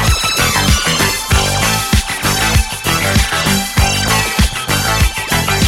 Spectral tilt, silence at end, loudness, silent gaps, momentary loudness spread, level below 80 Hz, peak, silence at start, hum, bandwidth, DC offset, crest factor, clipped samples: -3 dB/octave; 0 s; -13 LUFS; none; 3 LU; -20 dBFS; 0 dBFS; 0 s; none; 17 kHz; under 0.1%; 14 dB; under 0.1%